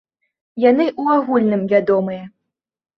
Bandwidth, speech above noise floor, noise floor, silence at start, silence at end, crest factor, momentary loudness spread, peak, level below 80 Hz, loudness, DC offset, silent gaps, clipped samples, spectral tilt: 6 kHz; 63 dB; -79 dBFS; 0.55 s; 0.7 s; 16 dB; 12 LU; -2 dBFS; -64 dBFS; -17 LUFS; under 0.1%; none; under 0.1%; -9 dB/octave